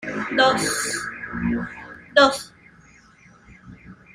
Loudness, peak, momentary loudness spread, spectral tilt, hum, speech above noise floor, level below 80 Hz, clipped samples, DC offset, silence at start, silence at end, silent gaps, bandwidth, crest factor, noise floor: -21 LUFS; -2 dBFS; 17 LU; -3 dB/octave; none; 31 dB; -50 dBFS; under 0.1%; under 0.1%; 0 s; 0.2 s; none; 15.5 kHz; 22 dB; -52 dBFS